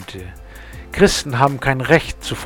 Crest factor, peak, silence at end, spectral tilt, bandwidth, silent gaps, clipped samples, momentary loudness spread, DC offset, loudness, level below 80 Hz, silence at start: 18 dB; 0 dBFS; 0 s; -4.5 dB/octave; 19 kHz; none; under 0.1%; 21 LU; under 0.1%; -16 LUFS; -34 dBFS; 0 s